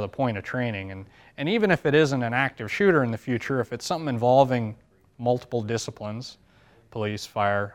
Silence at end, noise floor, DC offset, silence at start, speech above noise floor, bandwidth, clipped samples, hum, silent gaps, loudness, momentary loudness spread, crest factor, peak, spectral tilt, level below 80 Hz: 0.05 s; -55 dBFS; under 0.1%; 0 s; 31 dB; 16 kHz; under 0.1%; none; none; -25 LUFS; 15 LU; 20 dB; -6 dBFS; -6 dB/octave; -60 dBFS